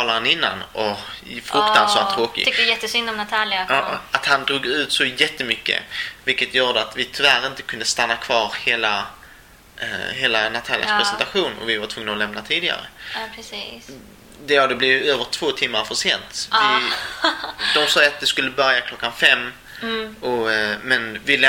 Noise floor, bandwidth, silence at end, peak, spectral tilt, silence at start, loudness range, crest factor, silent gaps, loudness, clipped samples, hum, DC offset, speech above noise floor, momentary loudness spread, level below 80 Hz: -46 dBFS; 17 kHz; 0 s; 0 dBFS; -1.5 dB/octave; 0 s; 4 LU; 20 dB; none; -19 LUFS; under 0.1%; none; under 0.1%; 26 dB; 12 LU; -54 dBFS